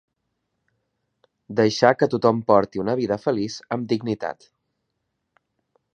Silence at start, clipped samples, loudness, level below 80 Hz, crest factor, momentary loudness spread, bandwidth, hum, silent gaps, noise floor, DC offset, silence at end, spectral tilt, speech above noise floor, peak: 1.5 s; under 0.1%; -22 LUFS; -62 dBFS; 24 dB; 11 LU; 9.4 kHz; none; none; -77 dBFS; under 0.1%; 1.65 s; -6 dB/octave; 56 dB; 0 dBFS